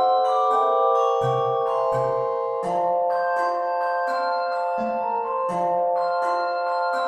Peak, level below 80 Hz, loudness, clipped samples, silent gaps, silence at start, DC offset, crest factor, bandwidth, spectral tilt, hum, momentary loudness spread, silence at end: -8 dBFS; -68 dBFS; -23 LUFS; under 0.1%; none; 0 s; under 0.1%; 14 dB; 10 kHz; -5.5 dB/octave; none; 5 LU; 0 s